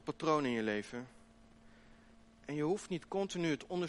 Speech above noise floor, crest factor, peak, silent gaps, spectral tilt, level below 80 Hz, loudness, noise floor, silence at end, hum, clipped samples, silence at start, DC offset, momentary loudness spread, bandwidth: 25 dB; 18 dB; -20 dBFS; none; -5.5 dB/octave; -68 dBFS; -37 LUFS; -62 dBFS; 0 s; none; under 0.1%; 0.05 s; under 0.1%; 14 LU; 11.5 kHz